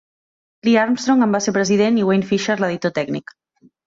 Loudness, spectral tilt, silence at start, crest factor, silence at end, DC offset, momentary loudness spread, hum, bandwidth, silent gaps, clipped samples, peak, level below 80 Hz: -18 LUFS; -5 dB/octave; 0.65 s; 16 dB; 0.65 s; under 0.1%; 8 LU; none; 7.8 kHz; none; under 0.1%; -4 dBFS; -60 dBFS